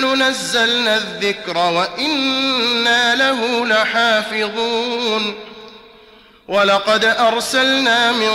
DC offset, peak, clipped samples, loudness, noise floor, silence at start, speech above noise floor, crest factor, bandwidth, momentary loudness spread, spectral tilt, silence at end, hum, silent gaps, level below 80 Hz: under 0.1%; -6 dBFS; under 0.1%; -15 LUFS; -46 dBFS; 0 s; 30 dB; 12 dB; 16 kHz; 7 LU; -2 dB/octave; 0 s; none; none; -58 dBFS